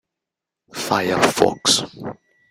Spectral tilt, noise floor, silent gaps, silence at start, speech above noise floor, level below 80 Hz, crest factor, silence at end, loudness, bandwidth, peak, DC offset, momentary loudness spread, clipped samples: -2.5 dB/octave; -85 dBFS; none; 0.75 s; 66 dB; -56 dBFS; 22 dB; 0.4 s; -18 LUFS; 16 kHz; 0 dBFS; under 0.1%; 18 LU; under 0.1%